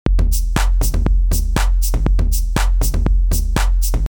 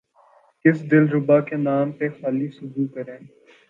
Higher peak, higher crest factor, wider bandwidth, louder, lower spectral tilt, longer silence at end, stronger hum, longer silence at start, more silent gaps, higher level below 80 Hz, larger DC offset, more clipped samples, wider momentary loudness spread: about the same, -2 dBFS vs -2 dBFS; second, 12 dB vs 20 dB; first, over 20 kHz vs 4.2 kHz; first, -18 LUFS vs -21 LUFS; second, -5 dB/octave vs -10.5 dB/octave; second, 0.05 s vs 0.45 s; neither; second, 0.05 s vs 0.65 s; neither; first, -14 dBFS vs -72 dBFS; neither; neither; second, 1 LU vs 11 LU